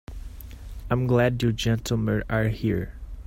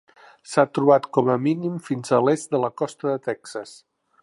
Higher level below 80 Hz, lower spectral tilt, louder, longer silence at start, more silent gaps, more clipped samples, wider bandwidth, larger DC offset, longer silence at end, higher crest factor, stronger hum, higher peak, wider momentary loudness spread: first, -38 dBFS vs -70 dBFS; about the same, -6.5 dB/octave vs -6.5 dB/octave; second, -25 LUFS vs -22 LUFS; second, 0.1 s vs 0.5 s; neither; neither; first, 16 kHz vs 11.5 kHz; neither; second, 0.05 s vs 0.5 s; about the same, 16 dB vs 20 dB; neither; second, -8 dBFS vs -2 dBFS; first, 20 LU vs 13 LU